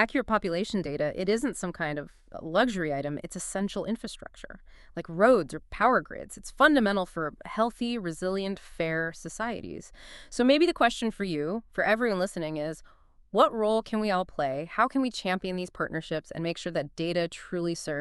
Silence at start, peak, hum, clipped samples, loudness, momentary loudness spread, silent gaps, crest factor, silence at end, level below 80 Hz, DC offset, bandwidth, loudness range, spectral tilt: 0 s; -6 dBFS; none; under 0.1%; -28 LUFS; 15 LU; none; 22 dB; 0 s; -54 dBFS; under 0.1%; 12 kHz; 5 LU; -5 dB/octave